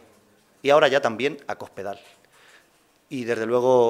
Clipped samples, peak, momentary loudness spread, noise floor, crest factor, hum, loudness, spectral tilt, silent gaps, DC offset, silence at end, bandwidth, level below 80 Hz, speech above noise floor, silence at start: under 0.1%; -2 dBFS; 18 LU; -61 dBFS; 22 dB; none; -23 LUFS; -5 dB/octave; none; under 0.1%; 0 s; 14.5 kHz; -72 dBFS; 39 dB; 0.65 s